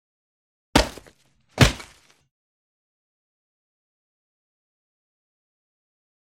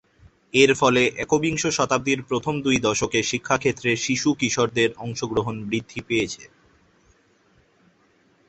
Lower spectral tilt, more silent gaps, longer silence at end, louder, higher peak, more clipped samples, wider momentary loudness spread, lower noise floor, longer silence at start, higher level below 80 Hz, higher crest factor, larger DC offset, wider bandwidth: about the same, -4.5 dB/octave vs -4 dB/octave; neither; first, 4.4 s vs 2.05 s; about the same, -21 LUFS vs -22 LUFS; about the same, 0 dBFS vs -2 dBFS; neither; first, 18 LU vs 9 LU; about the same, -58 dBFS vs -61 dBFS; first, 0.75 s vs 0.55 s; first, -38 dBFS vs -54 dBFS; first, 30 dB vs 20 dB; neither; first, 16 kHz vs 8.4 kHz